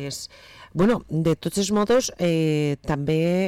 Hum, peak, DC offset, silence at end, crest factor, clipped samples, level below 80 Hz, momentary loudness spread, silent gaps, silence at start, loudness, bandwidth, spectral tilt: none; -12 dBFS; under 0.1%; 0 s; 10 dB; under 0.1%; -48 dBFS; 12 LU; none; 0 s; -23 LUFS; 15.5 kHz; -5.5 dB/octave